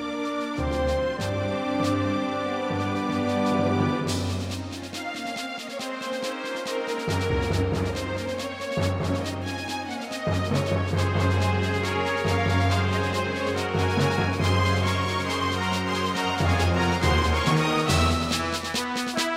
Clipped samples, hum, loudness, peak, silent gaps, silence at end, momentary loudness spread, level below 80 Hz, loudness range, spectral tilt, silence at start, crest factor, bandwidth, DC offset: under 0.1%; none; -25 LUFS; -10 dBFS; none; 0 s; 8 LU; -40 dBFS; 5 LU; -5.5 dB/octave; 0 s; 16 dB; 16 kHz; under 0.1%